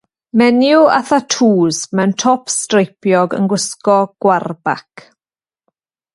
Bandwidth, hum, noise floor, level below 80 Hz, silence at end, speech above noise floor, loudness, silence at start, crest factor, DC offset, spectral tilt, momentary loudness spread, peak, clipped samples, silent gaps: 11.5 kHz; none; under -90 dBFS; -62 dBFS; 1.35 s; over 77 dB; -14 LUFS; 0.35 s; 14 dB; under 0.1%; -4.5 dB/octave; 7 LU; 0 dBFS; under 0.1%; none